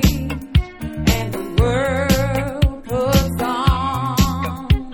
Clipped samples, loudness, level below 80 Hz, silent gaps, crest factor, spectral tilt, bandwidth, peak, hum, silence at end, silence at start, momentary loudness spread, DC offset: under 0.1%; -19 LUFS; -24 dBFS; none; 16 dB; -5.5 dB/octave; 19 kHz; -2 dBFS; none; 0 s; 0 s; 4 LU; under 0.1%